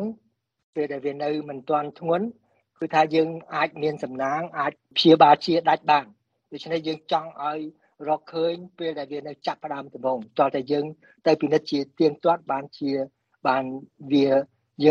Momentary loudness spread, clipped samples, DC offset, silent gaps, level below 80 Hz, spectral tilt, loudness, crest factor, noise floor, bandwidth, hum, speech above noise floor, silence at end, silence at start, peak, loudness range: 14 LU; under 0.1%; under 0.1%; 0.63-0.73 s; -70 dBFS; -6.5 dB/octave; -24 LUFS; 22 dB; -61 dBFS; 7.4 kHz; none; 38 dB; 0 s; 0 s; -2 dBFS; 8 LU